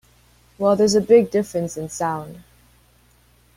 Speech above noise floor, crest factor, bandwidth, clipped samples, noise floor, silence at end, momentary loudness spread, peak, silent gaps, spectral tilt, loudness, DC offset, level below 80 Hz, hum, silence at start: 37 dB; 20 dB; 15.5 kHz; under 0.1%; -56 dBFS; 1.15 s; 13 LU; -2 dBFS; none; -5 dB/octave; -19 LUFS; under 0.1%; -56 dBFS; 60 Hz at -50 dBFS; 0.6 s